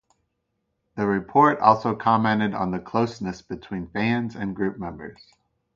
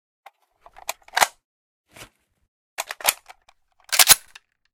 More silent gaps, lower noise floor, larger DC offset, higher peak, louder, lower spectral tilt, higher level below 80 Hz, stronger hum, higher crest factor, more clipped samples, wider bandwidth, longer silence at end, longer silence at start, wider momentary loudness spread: second, none vs 1.45-1.84 s, 2.48-2.77 s; first, -76 dBFS vs -60 dBFS; neither; about the same, -2 dBFS vs 0 dBFS; second, -23 LUFS vs -18 LUFS; first, -7.5 dB/octave vs 2 dB/octave; about the same, -54 dBFS vs -58 dBFS; neither; about the same, 22 dB vs 26 dB; neither; second, 7.4 kHz vs over 20 kHz; about the same, 0.65 s vs 0.55 s; second, 0.95 s vs 1.15 s; second, 16 LU vs 22 LU